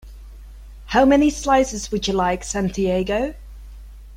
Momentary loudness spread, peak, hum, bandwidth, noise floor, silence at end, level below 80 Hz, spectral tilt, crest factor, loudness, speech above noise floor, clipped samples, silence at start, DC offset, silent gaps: 9 LU; -4 dBFS; none; 15.5 kHz; -39 dBFS; 0 s; -36 dBFS; -4.5 dB/octave; 18 dB; -20 LUFS; 20 dB; under 0.1%; 0.05 s; under 0.1%; none